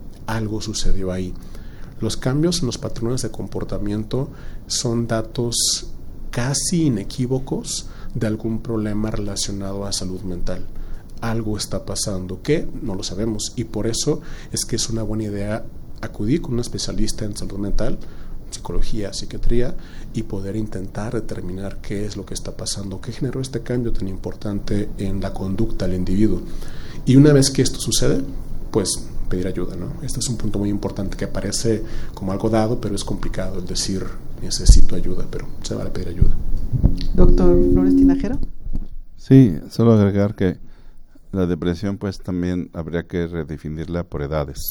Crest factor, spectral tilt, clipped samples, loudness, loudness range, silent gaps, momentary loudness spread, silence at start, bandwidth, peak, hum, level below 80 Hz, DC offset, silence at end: 18 dB; -5.5 dB/octave; under 0.1%; -22 LUFS; 9 LU; none; 14 LU; 0 s; 12.5 kHz; 0 dBFS; none; -24 dBFS; under 0.1%; 0 s